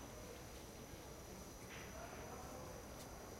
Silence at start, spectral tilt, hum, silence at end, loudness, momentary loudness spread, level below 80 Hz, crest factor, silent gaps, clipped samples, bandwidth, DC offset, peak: 0 s; -4 dB/octave; none; 0 s; -53 LUFS; 3 LU; -62 dBFS; 14 dB; none; under 0.1%; 16 kHz; under 0.1%; -40 dBFS